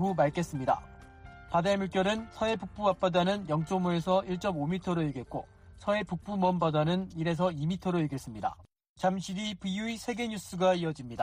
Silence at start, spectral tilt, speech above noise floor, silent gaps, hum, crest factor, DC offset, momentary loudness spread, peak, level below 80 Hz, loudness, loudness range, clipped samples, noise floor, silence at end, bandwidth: 0 s; -6.5 dB/octave; 20 dB; 8.89-8.96 s; none; 16 dB; under 0.1%; 8 LU; -14 dBFS; -56 dBFS; -31 LUFS; 3 LU; under 0.1%; -50 dBFS; 0 s; 15.5 kHz